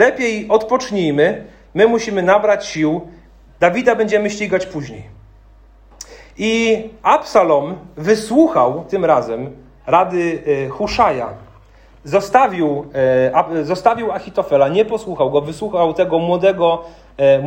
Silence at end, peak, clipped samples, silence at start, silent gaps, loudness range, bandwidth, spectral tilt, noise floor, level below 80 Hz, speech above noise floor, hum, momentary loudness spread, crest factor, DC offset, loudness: 0 s; 0 dBFS; under 0.1%; 0 s; none; 4 LU; 16 kHz; -5.5 dB/octave; -45 dBFS; -46 dBFS; 30 dB; none; 12 LU; 16 dB; under 0.1%; -16 LUFS